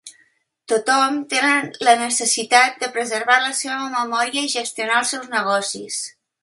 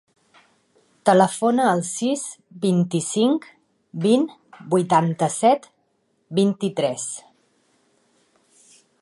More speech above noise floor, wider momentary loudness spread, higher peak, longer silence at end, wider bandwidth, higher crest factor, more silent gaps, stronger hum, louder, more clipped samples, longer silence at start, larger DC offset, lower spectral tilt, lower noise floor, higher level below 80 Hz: second, 41 dB vs 48 dB; about the same, 8 LU vs 10 LU; about the same, 0 dBFS vs -2 dBFS; second, 0.35 s vs 1.8 s; about the same, 11.5 kHz vs 11.5 kHz; about the same, 20 dB vs 20 dB; neither; neither; about the same, -19 LUFS vs -21 LUFS; neither; second, 0.05 s vs 1.05 s; neither; second, -0.5 dB/octave vs -5.5 dB/octave; second, -61 dBFS vs -68 dBFS; about the same, -74 dBFS vs -72 dBFS